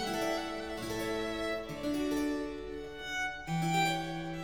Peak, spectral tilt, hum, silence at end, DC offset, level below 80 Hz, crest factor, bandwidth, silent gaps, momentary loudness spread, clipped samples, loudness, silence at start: -20 dBFS; -4.5 dB/octave; none; 0 s; 0.2%; -56 dBFS; 16 dB; over 20 kHz; none; 8 LU; under 0.1%; -35 LUFS; 0 s